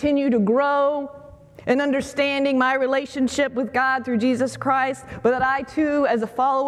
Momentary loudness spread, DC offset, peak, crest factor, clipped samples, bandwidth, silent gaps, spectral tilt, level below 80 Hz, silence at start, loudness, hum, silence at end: 4 LU; under 0.1%; -6 dBFS; 16 dB; under 0.1%; 12.5 kHz; none; -5 dB/octave; -54 dBFS; 0 s; -21 LUFS; none; 0 s